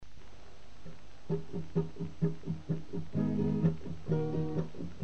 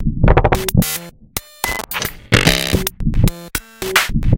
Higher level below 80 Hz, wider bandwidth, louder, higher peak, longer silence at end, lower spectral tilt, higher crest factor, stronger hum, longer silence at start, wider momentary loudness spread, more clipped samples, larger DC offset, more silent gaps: second, -56 dBFS vs -22 dBFS; second, 6.8 kHz vs 17.5 kHz; second, -35 LUFS vs -17 LUFS; second, -16 dBFS vs 0 dBFS; about the same, 0 s vs 0 s; first, -9.5 dB/octave vs -4.5 dB/octave; about the same, 18 dB vs 16 dB; neither; about the same, 0 s vs 0 s; first, 23 LU vs 12 LU; neither; first, 1% vs under 0.1%; neither